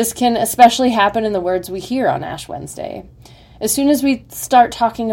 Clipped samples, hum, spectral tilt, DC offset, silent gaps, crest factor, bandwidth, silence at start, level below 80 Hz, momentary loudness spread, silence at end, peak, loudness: 0.3%; none; -3.5 dB/octave; under 0.1%; none; 16 dB; 17 kHz; 0 s; -46 dBFS; 17 LU; 0 s; 0 dBFS; -15 LUFS